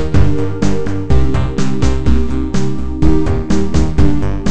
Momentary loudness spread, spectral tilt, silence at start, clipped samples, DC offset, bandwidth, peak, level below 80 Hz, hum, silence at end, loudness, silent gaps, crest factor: 4 LU; -7.5 dB/octave; 0 s; 0.2%; 20%; 9 kHz; 0 dBFS; -18 dBFS; none; 0 s; -16 LUFS; none; 12 dB